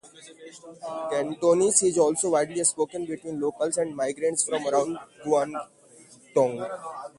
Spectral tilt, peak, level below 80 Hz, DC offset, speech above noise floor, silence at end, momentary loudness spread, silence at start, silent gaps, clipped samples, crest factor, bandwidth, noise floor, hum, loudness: -3.5 dB/octave; -6 dBFS; -70 dBFS; under 0.1%; 27 dB; 0.1 s; 17 LU; 0.05 s; none; under 0.1%; 20 dB; 11.5 kHz; -53 dBFS; none; -25 LUFS